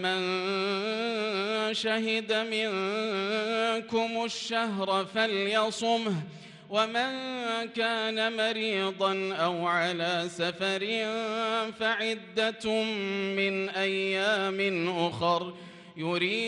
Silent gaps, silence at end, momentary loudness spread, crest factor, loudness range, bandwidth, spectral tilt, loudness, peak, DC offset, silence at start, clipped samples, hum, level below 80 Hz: none; 0 s; 4 LU; 16 dB; 1 LU; 11.5 kHz; -4 dB/octave; -29 LUFS; -14 dBFS; under 0.1%; 0 s; under 0.1%; none; -74 dBFS